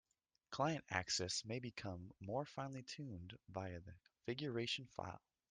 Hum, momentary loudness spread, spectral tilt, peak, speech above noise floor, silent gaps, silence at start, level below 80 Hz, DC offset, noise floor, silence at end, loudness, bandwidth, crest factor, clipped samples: none; 13 LU; -4 dB/octave; -22 dBFS; 23 dB; none; 0.5 s; -74 dBFS; under 0.1%; -69 dBFS; 0.35 s; -45 LUFS; 10.5 kHz; 24 dB; under 0.1%